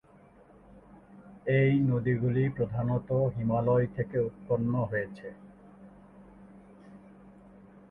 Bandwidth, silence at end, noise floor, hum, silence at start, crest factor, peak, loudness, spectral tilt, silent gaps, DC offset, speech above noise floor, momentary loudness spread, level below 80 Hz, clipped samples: 3.8 kHz; 0.6 s; -57 dBFS; none; 0.75 s; 18 dB; -14 dBFS; -29 LUFS; -11 dB/octave; none; under 0.1%; 29 dB; 9 LU; -58 dBFS; under 0.1%